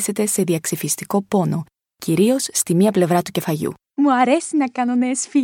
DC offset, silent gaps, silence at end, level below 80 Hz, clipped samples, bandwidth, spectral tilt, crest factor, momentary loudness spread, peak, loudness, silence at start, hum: under 0.1%; none; 0 s; -62 dBFS; under 0.1%; 18 kHz; -5 dB/octave; 16 dB; 7 LU; -2 dBFS; -19 LUFS; 0 s; none